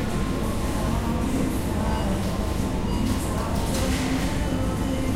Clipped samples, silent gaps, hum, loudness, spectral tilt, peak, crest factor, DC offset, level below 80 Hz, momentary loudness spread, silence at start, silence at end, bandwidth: under 0.1%; none; none; -26 LUFS; -5.5 dB/octave; -10 dBFS; 14 dB; under 0.1%; -30 dBFS; 2 LU; 0 s; 0 s; 16 kHz